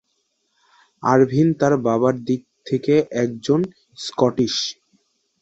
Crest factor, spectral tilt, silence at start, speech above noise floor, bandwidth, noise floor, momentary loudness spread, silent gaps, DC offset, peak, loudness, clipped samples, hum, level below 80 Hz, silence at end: 18 dB; -6 dB/octave; 1 s; 52 dB; 8.2 kHz; -70 dBFS; 9 LU; none; under 0.1%; -2 dBFS; -20 LUFS; under 0.1%; none; -60 dBFS; 0.7 s